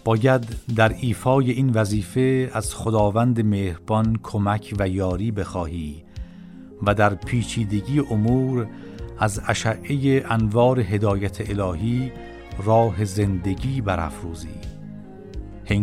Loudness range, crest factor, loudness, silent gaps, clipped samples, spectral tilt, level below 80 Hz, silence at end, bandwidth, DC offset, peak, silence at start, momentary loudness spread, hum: 4 LU; 18 dB; -22 LUFS; none; under 0.1%; -7 dB/octave; -40 dBFS; 0 s; 14 kHz; under 0.1%; -4 dBFS; 0.05 s; 18 LU; none